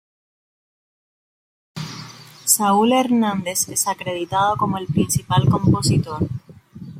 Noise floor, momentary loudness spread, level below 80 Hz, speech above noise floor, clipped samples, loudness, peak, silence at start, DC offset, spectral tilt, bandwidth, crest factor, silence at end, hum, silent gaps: -39 dBFS; 17 LU; -50 dBFS; 20 dB; under 0.1%; -19 LUFS; -2 dBFS; 1.75 s; under 0.1%; -4.5 dB/octave; 16.5 kHz; 20 dB; 0 s; none; none